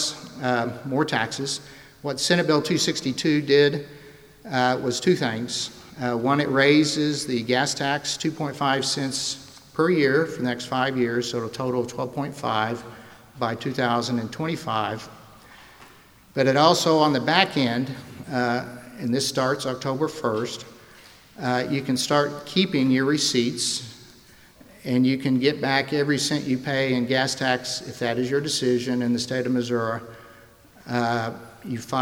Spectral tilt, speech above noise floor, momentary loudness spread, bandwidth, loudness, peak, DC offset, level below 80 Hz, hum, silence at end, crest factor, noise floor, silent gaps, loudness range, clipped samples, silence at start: -4.5 dB/octave; 28 dB; 12 LU; 17 kHz; -23 LUFS; -2 dBFS; under 0.1%; -62 dBFS; none; 0 s; 22 dB; -51 dBFS; none; 5 LU; under 0.1%; 0 s